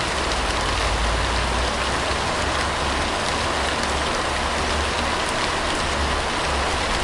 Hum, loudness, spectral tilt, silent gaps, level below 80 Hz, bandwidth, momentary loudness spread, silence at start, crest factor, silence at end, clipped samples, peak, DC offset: none; -22 LUFS; -3 dB/octave; none; -30 dBFS; 11.5 kHz; 1 LU; 0 s; 16 dB; 0 s; under 0.1%; -6 dBFS; under 0.1%